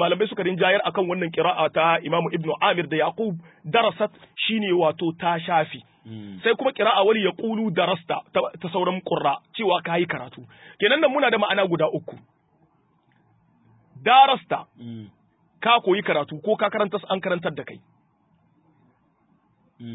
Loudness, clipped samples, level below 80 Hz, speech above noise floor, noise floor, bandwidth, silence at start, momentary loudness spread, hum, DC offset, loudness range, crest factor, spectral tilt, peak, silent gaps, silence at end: -22 LUFS; under 0.1%; -70 dBFS; 41 dB; -64 dBFS; 4 kHz; 0 s; 13 LU; none; under 0.1%; 3 LU; 20 dB; -9.5 dB/octave; -4 dBFS; none; 0 s